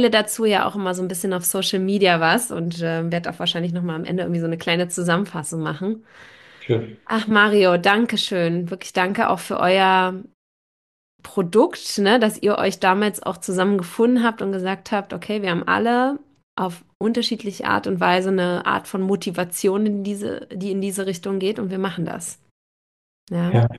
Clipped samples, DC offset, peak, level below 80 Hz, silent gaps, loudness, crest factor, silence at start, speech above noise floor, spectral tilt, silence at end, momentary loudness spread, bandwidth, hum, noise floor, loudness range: under 0.1%; under 0.1%; -2 dBFS; -64 dBFS; 10.34-11.19 s, 16.43-16.57 s, 16.95-17.00 s, 22.51-23.27 s; -21 LUFS; 20 dB; 0 s; over 70 dB; -4.5 dB/octave; 0 s; 10 LU; 12.5 kHz; none; under -90 dBFS; 5 LU